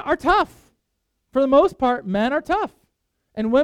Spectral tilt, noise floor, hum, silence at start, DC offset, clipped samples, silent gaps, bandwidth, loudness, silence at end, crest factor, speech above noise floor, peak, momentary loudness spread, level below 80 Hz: -6.5 dB/octave; -74 dBFS; none; 0 s; under 0.1%; under 0.1%; none; 12.5 kHz; -20 LUFS; 0 s; 16 dB; 56 dB; -4 dBFS; 12 LU; -46 dBFS